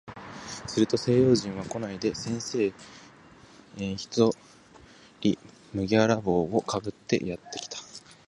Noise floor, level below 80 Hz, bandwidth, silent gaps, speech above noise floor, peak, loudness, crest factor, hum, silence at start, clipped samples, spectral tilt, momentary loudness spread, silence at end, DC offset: -53 dBFS; -56 dBFS; 11.5 kHz; none; 26 dB; -8 dBFS; -28 LUFS; 20 dB; none; 0.05 s; under 0.1%; -5.5 dB/octave; 17 LU; 0.3 s; under 0.1%